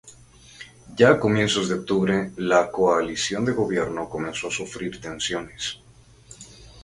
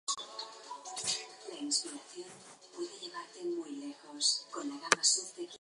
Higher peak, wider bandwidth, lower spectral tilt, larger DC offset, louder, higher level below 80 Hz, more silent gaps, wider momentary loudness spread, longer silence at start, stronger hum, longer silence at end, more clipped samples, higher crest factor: first, -2 dBFS vs -6 dBFS; about the same, 11.5 kHz vs 11.5 kHz; first, -4.5 dB/octave vs 0 dB/octave; neither; first, -23 LUFS vs -34 LUFS; first, -52 dBFS vs -88 dBFS; neither; first, 24 LU vs 18 LU; about the same, 0.05 s vs 0.05 s; neither; about the same, 0 s vs 0.05 s; neither; second, 22 dB vs 32 dB